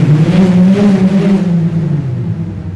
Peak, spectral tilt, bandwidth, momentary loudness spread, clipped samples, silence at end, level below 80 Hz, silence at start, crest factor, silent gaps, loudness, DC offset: -2 dBFS; -9 dB/octave; 8.6 kHz; 10 LU; under 0.1%; 0 s; -36 dBFS; 0 s; 8 dB; none; -11 LUFS; under 0.1%